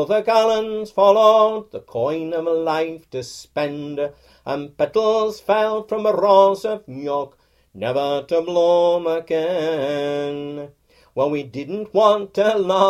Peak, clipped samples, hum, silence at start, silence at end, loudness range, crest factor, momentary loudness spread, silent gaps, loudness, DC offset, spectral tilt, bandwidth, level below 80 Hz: -2 dBFS; under 0.1%; none; 0 s; 0 s; 4 LU; 18 dB; 15 LU; none; -19 LUFS; under 0.1%; -5.5 dB/octave; 14 kHz; -60 dBFS